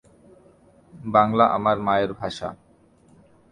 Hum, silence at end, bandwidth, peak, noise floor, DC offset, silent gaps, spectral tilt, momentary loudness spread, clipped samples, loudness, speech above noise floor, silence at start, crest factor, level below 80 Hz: none; 0.95 s; 10.5 kHz; -2 dBFS; -56 dBFS; under 0.1%; none; -6.5 dB/octave; 15 LU; under 0.1%; -21 LUFS; 35 dB; 0.95 s; 22 dB; -56 dBFS